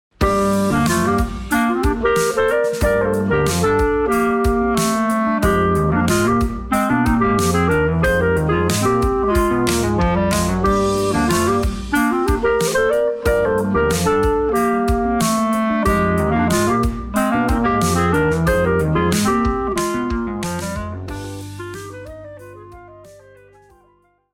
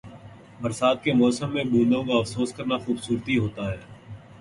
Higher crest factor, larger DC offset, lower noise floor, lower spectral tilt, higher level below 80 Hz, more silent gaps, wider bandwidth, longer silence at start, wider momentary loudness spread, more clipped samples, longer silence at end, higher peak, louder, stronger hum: about the same, 16 dB vs 18 dB; neither; first, -57 dBFS vs -45 dBFS; about the same, -5.5 dB/octave vs -6 dB/octave; first, -30 dBFS vs -54 dBFS; neither; first, 17.5 kHz vs 11.5 kHz; first, 0.2 s vs 0.05 s; second, 6 LU vs 18 LU; neither; first, 1.2 s vs 0.05 s; first, -2 dBFS vs -8 dBFS; first, -17 LUFS vs -24 LUFS; neither